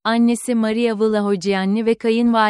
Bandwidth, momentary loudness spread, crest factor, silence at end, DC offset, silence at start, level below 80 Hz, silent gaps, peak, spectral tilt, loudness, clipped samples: 13 kHz; 2 LU; 12 dB; 0 s; under 0.1%; 0.05 s; -60 dBFS; none; -4 dBFS; -5.5 dB/octave; -18 LUFS; under 0.1%